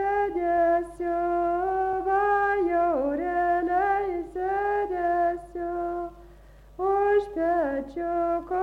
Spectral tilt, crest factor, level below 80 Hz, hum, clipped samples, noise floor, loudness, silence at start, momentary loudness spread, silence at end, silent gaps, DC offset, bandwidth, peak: -7 dB/octave; 12 dB; -50 dBFS; none; under 0.1%; -50 dBFS; -26 LUFS; 0 s; 8 LU; 0 s; none; under 0.1%; 10.5 kHz; -14 dBFS